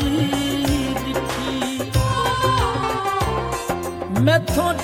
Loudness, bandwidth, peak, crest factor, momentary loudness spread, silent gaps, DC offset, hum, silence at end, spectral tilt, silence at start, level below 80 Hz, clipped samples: -21 LUFS; 17 kHz; -4 dBFS; 16 dB; 7 LU; none; under 0.1%; none; 0 s; -5 dB/octave; 0 s; -34 dBFS; under 0.1%